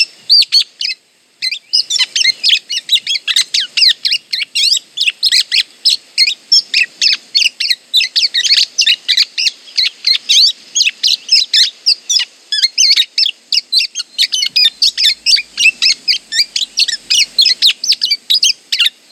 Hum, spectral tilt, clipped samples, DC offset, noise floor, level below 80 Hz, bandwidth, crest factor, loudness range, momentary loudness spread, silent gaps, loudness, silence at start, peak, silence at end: none; 5 dB/octave; under 0.1%; under 0.1%; -37 dBFS; -66 dBFS; over 20 kHz; 14 dB; 1 LU; 6 LU; none; -10 LUFS; 0 s; 0 dBFS; 0.2 s